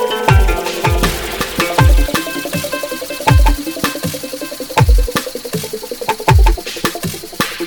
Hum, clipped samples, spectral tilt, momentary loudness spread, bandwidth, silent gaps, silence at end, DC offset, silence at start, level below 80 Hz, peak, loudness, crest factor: none; under 0.1%; -4.5 dB/octave; 10 LU; 19.5 kHz; none; 0 s; under 0.1%; 0 s; -18 dBFS; 0 dBFS; -16 LUFS; 14 dB